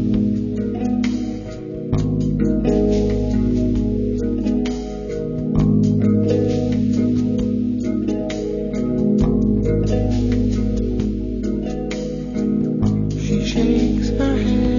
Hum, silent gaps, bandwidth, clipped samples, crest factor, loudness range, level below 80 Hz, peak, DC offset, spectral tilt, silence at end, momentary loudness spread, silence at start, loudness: none; none; 7.4 kHz; under 0.1%; 14 dB; 2 LU; -28 dBFS; -4 dBFS; under 0.1%; -8 dB/octave; 0 s; 7 LU; 0 s; -20 LUFS